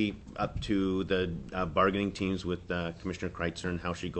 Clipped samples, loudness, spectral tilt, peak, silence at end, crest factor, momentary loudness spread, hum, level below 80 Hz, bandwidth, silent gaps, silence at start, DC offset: under 0.1%; -32 LUFS; -6 dB/octave; -12 dBFS; 0 s; 20 dB; 8 LU; none; -48 dBFS; 8.6 kHz; none; 0 s; under 0.1%